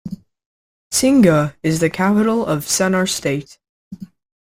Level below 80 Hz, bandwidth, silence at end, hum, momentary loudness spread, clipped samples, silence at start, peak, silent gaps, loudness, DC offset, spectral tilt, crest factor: -50 dBFS; 16.5 kHz; 0.4 s; none; 23 LU; under 0.1%; 0.05 s; -2 dBFS; 0.46-0.91 s, 3.69-3.91 s; -16 LUFS; under 0.1%; -4.5 dB/octave; 16 dB